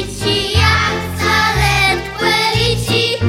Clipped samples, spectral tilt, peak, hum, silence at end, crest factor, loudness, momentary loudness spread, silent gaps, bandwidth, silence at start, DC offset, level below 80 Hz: under 0.1%; -4 dB/octave; 0 dBFS; none; 0 s; 14 dB; -14 LUFS; 5 LU; none; 16.5 kHz; 0 s; under 0.1%; -28 dBFS